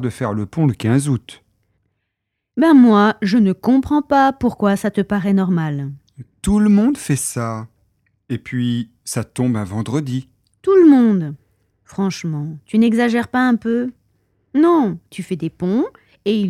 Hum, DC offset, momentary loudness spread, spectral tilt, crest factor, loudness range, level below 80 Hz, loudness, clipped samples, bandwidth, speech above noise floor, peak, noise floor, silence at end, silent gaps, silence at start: none; under 0.1%; 14 LU; -6.5 dB/octave; 16 dB; 5 LU; -46 dBFS; -17 LUFS; under 0.1%; 14.5 kHz; 61 dB; -2 dBFS; -77 dBFS; 0 s; none; 0 s